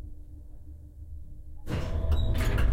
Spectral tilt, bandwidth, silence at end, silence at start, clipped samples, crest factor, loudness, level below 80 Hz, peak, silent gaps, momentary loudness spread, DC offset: -6.5 dB/octave; 16.5 kHz; 0 s; 0 s; under 0.1%; 16 dB; -30 LUFS; -32 dBFS; -14 dBFS; none; 20 LU; under 0.1%